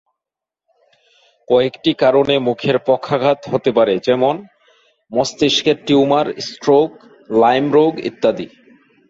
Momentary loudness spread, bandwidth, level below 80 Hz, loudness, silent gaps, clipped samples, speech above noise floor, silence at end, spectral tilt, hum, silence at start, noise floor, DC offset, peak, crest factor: 7 LU; 7.8 kHz; -58 dBFS; -16 LUFS; none; under 0.1%; 71 dB; 0.65 s; -5 dB/octave; none; 1.5 s; -86 dBFS; under 0.1%; -2 dBFS; 14 dB